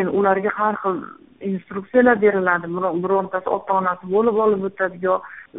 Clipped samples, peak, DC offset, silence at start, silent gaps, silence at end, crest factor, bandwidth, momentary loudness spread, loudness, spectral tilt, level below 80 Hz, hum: under 0.1%; -2 dBFS; 0.1%; 0 s; none; 0 s; 18 dB; 3.9 kHz; 11 LU; -20 LUFS; -1.5 dB/octave; -60 dBFS; none